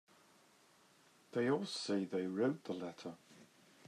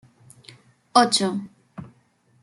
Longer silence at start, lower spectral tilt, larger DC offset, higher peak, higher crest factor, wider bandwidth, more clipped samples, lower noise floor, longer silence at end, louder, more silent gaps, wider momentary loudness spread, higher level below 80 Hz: first, 1.35 s vs 0.95 s; first, -5.5 dB/octave vs -3 dB/octave; neither; second, -24 dBFS vs -2 dBFS; second, 18 dB vs 24 dB; about the same, 13 kHz vs 12 kHz; neither; first, -68 dBFS vs -61 dBFS; second, 0.4 s vs 0.55 s; second, -39 LUFS vs -20 LUFS; neither; second, 14 LU vs 25 LU; second, under -90 dBFS vs -68 dBFS